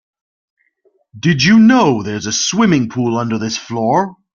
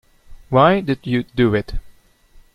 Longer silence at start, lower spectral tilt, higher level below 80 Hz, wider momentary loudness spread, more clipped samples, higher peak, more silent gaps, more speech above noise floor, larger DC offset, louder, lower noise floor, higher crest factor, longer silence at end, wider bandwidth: first, 1.15 s vs 0.3 s; second, -4.5 dB/octave vs -8.5 dB/octave; second, -52 dBFS vs -36 dBFS; second, 11 LU vs 14 LU; neither; about the same, -2 dBFS vs -2 dBFS; neither; first, 46 dB vs 32 dB; neither; first, -14 LUFS vs -18 LUFS; first, -59 dBFS vs -49 dBFS; about the same, 14 dB vs 18 dB; second, 0.2 s vs 0.65 s; second, 7.4 kHz vs 12 kHz